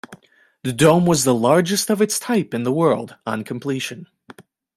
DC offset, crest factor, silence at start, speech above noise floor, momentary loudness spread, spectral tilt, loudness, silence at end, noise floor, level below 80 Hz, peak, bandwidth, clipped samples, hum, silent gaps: under 0.1%; 18 dB; 0.1 s; 34 dB; 12 LU; -5 dB/octave; -19 LUFS; 0.35 s; -52 dBFS; -56 dBFS; -2 dBFS; 16 kHz; under 0.1%; none; none